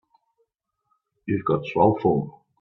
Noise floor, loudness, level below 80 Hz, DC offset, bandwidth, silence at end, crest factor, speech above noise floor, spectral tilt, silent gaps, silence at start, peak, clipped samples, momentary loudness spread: -75 dBFS; -23 LUFS; -58 dBFS; under 0.1%; 6 kHz; 0.3 s; 20 dB; 53 dB; -10 dB/octave; none; 1.25 s; -6 dBFS; under 0.1%; 15 LU